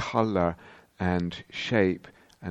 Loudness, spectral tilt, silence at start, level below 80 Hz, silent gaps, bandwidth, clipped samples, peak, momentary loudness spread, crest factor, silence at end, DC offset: -28 LUFS; -6.5 dB/octave; 0 s; -54 dBFS; none; 8.4 kHz; under 0.1%; -8 dBFS; 13 LU; 20 dB; 0 s; under 0.1%